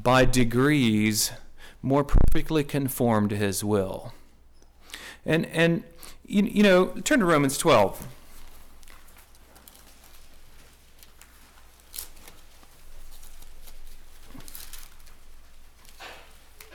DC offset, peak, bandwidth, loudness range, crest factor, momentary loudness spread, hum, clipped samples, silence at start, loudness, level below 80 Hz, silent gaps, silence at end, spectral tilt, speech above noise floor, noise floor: under 0.1%; -12 dBFS; 17.5 kHz; 24 LU; 14 dB; 23 LU; none; under 0.1%; 0 s; -23 LUFS; -34 dBFS; none; 0.55 s; -5 dB/octave; 30 dB; -52 dBFS